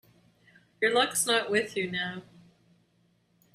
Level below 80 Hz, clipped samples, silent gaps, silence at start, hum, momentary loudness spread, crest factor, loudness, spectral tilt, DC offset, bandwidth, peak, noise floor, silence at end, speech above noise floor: -72 dBFS; under 0.1%; none; 0.8 s; none; 10 LU; 20 dB; -27 LUFS; -2 dB/octave; under 0.1%; 15.5 kHz; -10 dBFS; -69 dBFS; 1.3 s; 41 dB